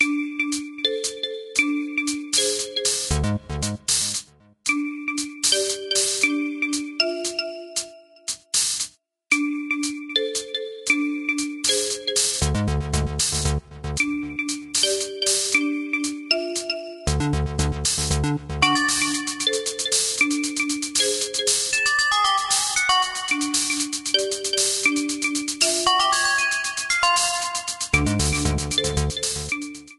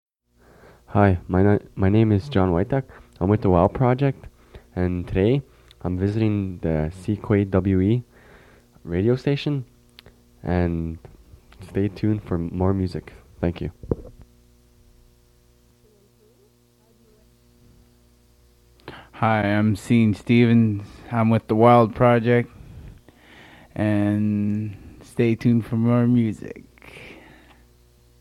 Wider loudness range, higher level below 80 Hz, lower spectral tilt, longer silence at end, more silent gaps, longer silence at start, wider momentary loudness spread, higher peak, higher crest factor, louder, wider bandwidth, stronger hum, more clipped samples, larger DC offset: second, 4 LU vs 9 LU; first, -36 dBFS vs -48 dBFS; second, -2.5 dB/octave vs -9 dB/octave; second, 0.05 s vs 1.05 s; neither; second, 0 s vs 0.9 s; second, 8 LU vs 18 LU; about the same, -2 dBFS vs -2 dBFS; about the same, 22 dB vs 20 dB; about the same, -22 LUFS vs -21 LUFS; about the same, 13 kHz vs 12 kHz; second, none vs 60 Hz at -45 dBFS; neither; neither